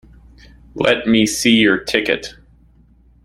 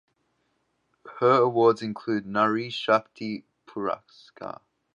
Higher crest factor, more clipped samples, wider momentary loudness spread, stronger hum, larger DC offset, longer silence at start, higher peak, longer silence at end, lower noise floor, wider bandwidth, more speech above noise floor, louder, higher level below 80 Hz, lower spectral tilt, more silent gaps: about the same, 18 dB vs 20 dB; neither; second, 12 LU vs 19 LU; neither; neither; second, 0.75 s vs 1.05 s; first, 0 dBFS vs -6 dBFS; first, 0.95 s vs 0.45 s; second, -50 dBFS vs -73 dBFS; first, 15.5 kHz vs 7.6 kHz; second, 35 dB vs 48 dB; first, -15 LUFS vs -25 LUFS; first, -46 dBFS vs -72 dBFS; second, -3.5 dB/octave vs -6.5 dB/octave; neither